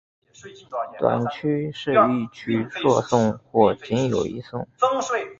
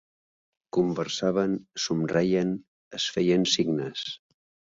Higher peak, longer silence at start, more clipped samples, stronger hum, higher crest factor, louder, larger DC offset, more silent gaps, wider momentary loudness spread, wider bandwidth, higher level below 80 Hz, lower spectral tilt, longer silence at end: first, -2 dBFS vs -8 dBFS; second, 0.45 s vs 0.75 s; neither; neither; about the same, 20 dB vs 20 dB; first, -22 LUFS vs -27 LUFS; neither; second, none vs 2.68-2.91 s; about the same, 11 LU vs 12 LU; about the same, 7.8 kHz vs 7.8 kHz; first, -56 dBFS vs -62 dBFS; first, -6 dB/octave vs -4.5 dB/octave; second, 0.05 s vs 0.55 s